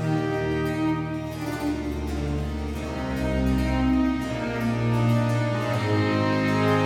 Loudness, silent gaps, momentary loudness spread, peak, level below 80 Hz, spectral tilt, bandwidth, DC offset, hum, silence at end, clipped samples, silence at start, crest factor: -25 LUFS; none; 8 LU; -10 dBFS; -36 dBFS; -7 dB/octave; 15.5 kHz; under 0.1%; none; 0 s; under 0.1%; 0 s; 14 dB